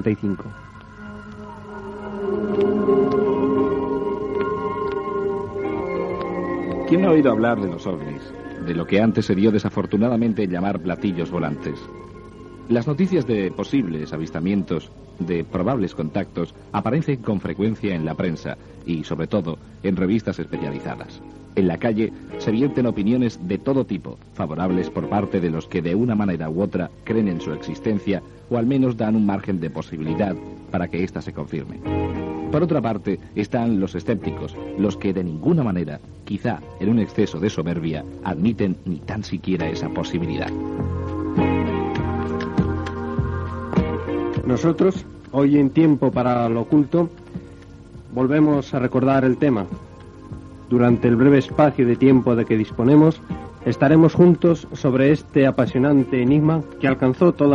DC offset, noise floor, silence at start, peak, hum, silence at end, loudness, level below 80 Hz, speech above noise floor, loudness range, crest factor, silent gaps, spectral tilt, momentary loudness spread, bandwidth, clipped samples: under 0.1%; -41 dBFS; 0 s; -2 dBFS; none; 0 s; -21 LUFS; -44 dBFS; 21 dB; 8 LU; 18 dB; none; -8.5 dB/octave; 14 LU; 7.6 kHz; under 0.1%